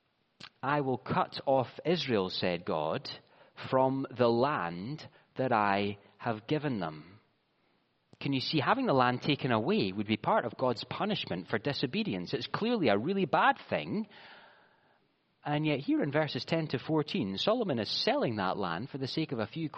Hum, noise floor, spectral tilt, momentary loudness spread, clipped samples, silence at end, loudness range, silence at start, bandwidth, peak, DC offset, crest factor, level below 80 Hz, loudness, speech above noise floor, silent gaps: none; -73 dBFS; -4 dB/octave; 10 LU; under 0.1%; 0 s; 4 LU; 0.4 s; 7 kHz; -12 dBFS; under 0.1%; 20 dB; -72 dBFS; -31 LUFS; 42 dB; none